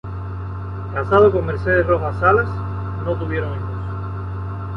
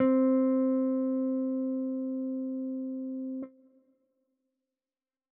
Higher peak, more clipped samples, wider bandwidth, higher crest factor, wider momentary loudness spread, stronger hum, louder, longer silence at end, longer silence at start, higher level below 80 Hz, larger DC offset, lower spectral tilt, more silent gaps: first, -2 dBFS vs -16 dBFS; neither; first, 5.6 kHz vs 2.5 kHz; about the same, 18 dB vs 16 dB; first, 15 LU vs 12 LU; neither; first, -20 LUFS vs -30 LUFS; second, 0 s vs 1.85 s; about the same, 0.05 s vs 0 s; first, -34 dBFS vs -86 dBFS; neither; first, -9.5 dB/octave vs -4.5 dB/octave; neither